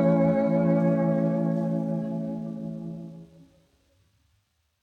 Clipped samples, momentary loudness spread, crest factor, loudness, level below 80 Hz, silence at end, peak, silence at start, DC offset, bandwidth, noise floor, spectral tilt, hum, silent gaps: under 0.1%; 15 LU; 14 dB; -26 LUFS; -64 dBFS; 1.6 s; -12 dBFS; 0 s; under 0.1%; 4.6 kHz; -71 dBFS; -11 dB/octave; none; none